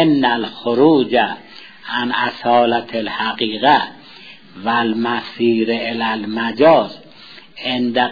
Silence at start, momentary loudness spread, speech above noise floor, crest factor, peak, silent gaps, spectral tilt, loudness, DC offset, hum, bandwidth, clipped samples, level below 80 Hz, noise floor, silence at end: 0 s; 14 LU; 25 dB; 16 dB; 0 dBFS; none; -7 dB/octave; -17 LUFS; 0.4%; none; 5 kHz; under 0.1%; -62 dBFS; -41 dBFS; 0 s